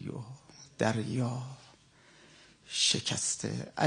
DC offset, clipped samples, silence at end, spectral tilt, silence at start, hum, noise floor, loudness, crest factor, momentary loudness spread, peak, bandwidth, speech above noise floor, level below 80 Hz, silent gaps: under 0.1%; under 0.1%; 0 s; -3 dB/octave; 0 s; none; -60 dBFS; -31 LUFS; 24 dB; 23 LU; -12 dBFS; 10 kHz; 29 dB; -70 dBFS; none